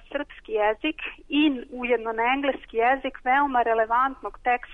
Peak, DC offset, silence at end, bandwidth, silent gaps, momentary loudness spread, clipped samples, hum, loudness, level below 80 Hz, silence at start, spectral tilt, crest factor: -12 dBFS; under 0.1%; 0 s; 4 kHz; none; 8 LU; under 0.1%; none; -24 LUFS; -52 dBFS; 0.1 s; -5.5 dB/octave; 12 dB